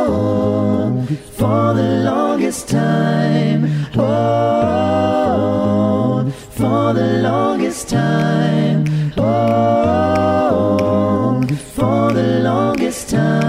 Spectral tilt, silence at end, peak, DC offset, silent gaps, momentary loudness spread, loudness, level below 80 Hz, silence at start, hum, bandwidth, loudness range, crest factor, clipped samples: -7 dB/octave; 0 s; -2 dBFS; under 0.1%; none; 4 LU; -16 LUFS; -44 dBFS; 0 s; none; 15.5 kHz; 1 LU; 12 dB; under 0.1%